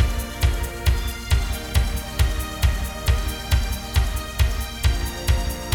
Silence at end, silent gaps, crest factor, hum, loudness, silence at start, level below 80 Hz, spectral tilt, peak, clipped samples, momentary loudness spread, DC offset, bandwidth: 0 s; none; 16 dB; none; -24 LUFS; 0 s; -24 dBFS; -4.5 dB/octave; -6 dBFS; under 0.1%; 1 LU; under 0.1%; 19 kHz